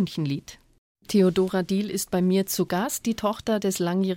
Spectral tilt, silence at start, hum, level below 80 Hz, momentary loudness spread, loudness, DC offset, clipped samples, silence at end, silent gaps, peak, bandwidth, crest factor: -5.5 dB/octave; 0 s; none; -56 dBFS; 6 LU; -25 LUFS; under 0.1%; under 0.1%; 0 s; 0.78-0.95 s; -10 dBFS; 17 kHz; 16 dB